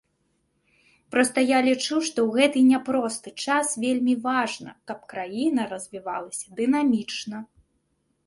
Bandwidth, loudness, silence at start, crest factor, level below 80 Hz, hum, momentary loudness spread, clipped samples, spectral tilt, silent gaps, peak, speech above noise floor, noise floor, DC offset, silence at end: 11.5 kHz; -24 LUFS; 1.1 s; 20 dB; -68 dBFS; none; 14 LU; under 0.1%; -3 dB/octave; none; -6 dBFS; 48 dB; -72 dBFS; under 0.1%; 0.8 s